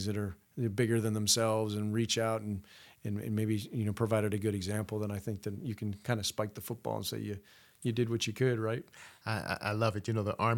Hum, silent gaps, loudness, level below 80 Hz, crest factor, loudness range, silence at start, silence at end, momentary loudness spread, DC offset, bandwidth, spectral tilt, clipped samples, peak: none; none; -34 LUFS; -66 dBFS; 20 dB; 4 LU; 0 s; 0 s; 10 LU; under 0.1%; 18.5 kHz; -5 dB/octave; under 0.1%; -14 dBFS